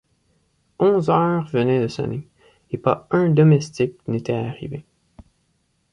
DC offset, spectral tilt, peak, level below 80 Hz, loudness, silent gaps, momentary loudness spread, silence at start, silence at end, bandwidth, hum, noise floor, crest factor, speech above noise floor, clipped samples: under 0.1%; -8 dB/octave; -2 dBFS; -56 dBFS; -20 LUFS; none; 17 LU; 0.8 s; 1.1 s; 9.8 kHz; none; -67 dBFS; 18 dB; 48 dB; under 0.1%